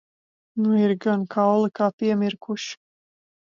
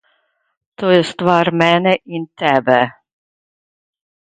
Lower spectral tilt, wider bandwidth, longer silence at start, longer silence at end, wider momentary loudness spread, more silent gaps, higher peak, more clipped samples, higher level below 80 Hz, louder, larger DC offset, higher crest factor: about the same, -6.5 dB/octave vs -6 dB/octave; second, 7.4 kHz vs 9.4 kHz; second, 0.55 s vs 0.8 s; second, 0.85 s vs 1.45 s; first, 12 LU vs 8 LU; first, 1.93-1.98 s vs none; second, -8 dBFS vs 0 dBFS; neither; second, -74 dBFS vs -60 dBFS; second, -23 LUFS vs -15 LUFS; neither; about the same, 16 dB vs 18 dB